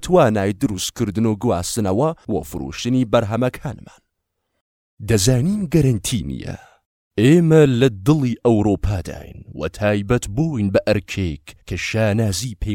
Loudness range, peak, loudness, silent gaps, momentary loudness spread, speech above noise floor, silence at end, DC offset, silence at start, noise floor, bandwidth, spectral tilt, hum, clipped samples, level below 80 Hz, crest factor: 5 LU; 0 dBFS; -19 LUFS; 4.61-4.97 s, 6.85-7.11 s; 15 LU; 57 dB; 0 s; under 0.1%; 0 s; -75 dBFS; 17 kHz; -6 dB/octave; none; under 0.1%; -38 dBFS; 18 dB